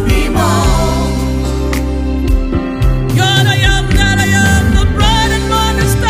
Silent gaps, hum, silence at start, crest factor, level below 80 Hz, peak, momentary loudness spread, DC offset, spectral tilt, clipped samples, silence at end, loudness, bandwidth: none; none; 0 s; 10 dB; -16 dBFS; 0 dBFS; 6 LU; under 0.1%; -5 dB/octave; under 0.1%; 0 s; -12 LUFS; 16 kHz